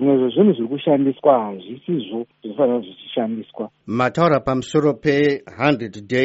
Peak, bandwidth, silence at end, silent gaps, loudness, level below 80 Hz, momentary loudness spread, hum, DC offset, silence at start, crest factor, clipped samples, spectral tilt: -2 dBFS; 8 kHz; 0 s; none; -19 LUFS; -56 dBFS; 13 LU; none; under 0.1%; 0 s; 16 dB; under 0.1%; -5.5 dB/octave